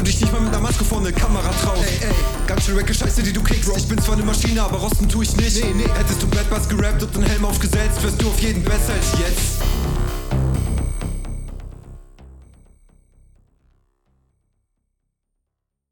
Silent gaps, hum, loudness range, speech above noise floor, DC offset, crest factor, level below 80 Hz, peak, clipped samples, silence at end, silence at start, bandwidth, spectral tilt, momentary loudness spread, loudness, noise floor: none; none; 8 LU; 61 dB; under 0.1%; 14 dB; -22 dBFS; -6 dBFS; under 0.1%; 3.6 s; 0 s; 19 kHz; -4.5 dB/octave; 5 LU; -20 LUFS; -78 dBFS